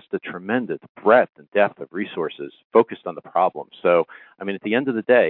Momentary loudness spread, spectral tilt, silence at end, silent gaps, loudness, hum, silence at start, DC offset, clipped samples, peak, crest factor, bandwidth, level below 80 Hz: 13 LU; -9.5 dB/octave; 0 s; 0.89-0.95 s, 1.29-1.33 s, 1.48-1.52 s, 2.64-2.70 s; -22 LUFS; none; 0.15 s; under 0.1%; under 0.1%; -2 dBFS; 20 dB; 4.2 kHz; -76 dBFS